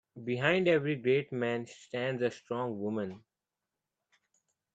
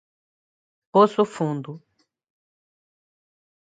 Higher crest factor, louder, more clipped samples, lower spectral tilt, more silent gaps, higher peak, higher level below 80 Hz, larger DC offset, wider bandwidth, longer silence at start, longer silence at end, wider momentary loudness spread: about the same, 22 dB vs 22 dB; second, -32 LUFS vs -21 LUFS; neither; about the same, -6.5 dB/octave vs -7 dB/octave; neither; second, -12 dBFS vs -4 dBFS; about the same, -76 dBFS vs -78 dBFS; neither; second, 8 kHz vs 9.2 kHz; second, 0.15 s vs 0.95 s; second, 1.55 s vs 1.85 s; second, 10 LU vs 14 LU